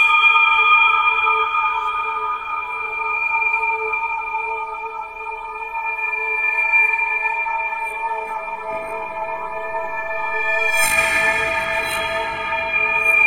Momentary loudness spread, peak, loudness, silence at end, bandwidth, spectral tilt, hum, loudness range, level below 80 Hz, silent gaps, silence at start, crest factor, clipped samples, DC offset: 14 LU; -2 dBFS; -18 LUFS; 0 s; 16 kHz; -0.5 dB/octave; none; 5 LU; -50 dBFS; none; 0 s; 16 dB; under 0.1%; under 0.1%